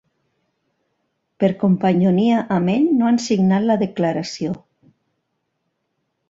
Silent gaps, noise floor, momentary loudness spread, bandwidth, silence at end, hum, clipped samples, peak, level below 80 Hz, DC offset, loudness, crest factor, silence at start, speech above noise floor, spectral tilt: none; -73 dBFS; 9 LU; 7.8 kHz; 1.75 s; none; under 0.1%; -4 dBFS; -60 dBFS; under 0.1%; -18 LUFS; 16 dB; 1.4 s; 56 dB; -7 dB/octave